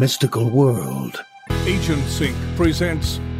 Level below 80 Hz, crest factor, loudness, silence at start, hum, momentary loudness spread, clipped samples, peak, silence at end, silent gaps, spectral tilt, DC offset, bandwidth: -32 dBFS; 16 dB; -20 LUFS; 0 s; none; 10 LU; under 0.1%; -4 dBFS; 0 s; none; -5.5 dB/octave; under 0.1%; 16 kHz